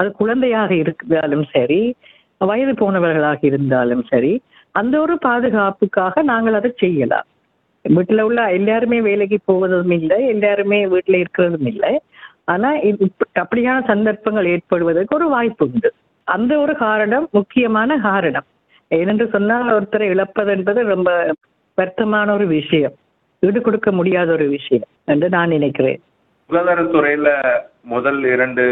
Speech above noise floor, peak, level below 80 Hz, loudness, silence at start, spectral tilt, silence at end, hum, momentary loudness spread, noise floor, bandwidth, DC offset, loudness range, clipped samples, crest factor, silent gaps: 47 dB; -2 dBFS; -56 dBFS; -16 LUFS; 0 s; -10 dB/octave; 0 s; none; 5 LU; -63 dBFS; 4 kHz; under 0.1%; 2 LU; under 0.1%; 14 dB; none